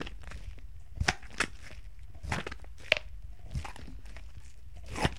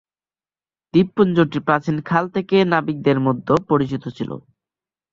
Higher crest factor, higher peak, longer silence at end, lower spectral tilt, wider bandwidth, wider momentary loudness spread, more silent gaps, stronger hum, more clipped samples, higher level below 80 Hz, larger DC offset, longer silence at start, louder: first, 36 dB vs 18 dB; about the same, -2 dBFS vs -2 dBFS; second, 0 s vs 0.75 s; second, -3.5 dB/octave vs -8 dB/octave; first, 16.5 kHz vs 7.4 kHz; first, 21 LU vs 11 LU; neither; neither; neither; first, -44 dBFS vs -56 dBFS; first, 0.7% vs under 0.1%; second, 0 s vs 0.95 s; second, -35 LUFS vs -19 LUFS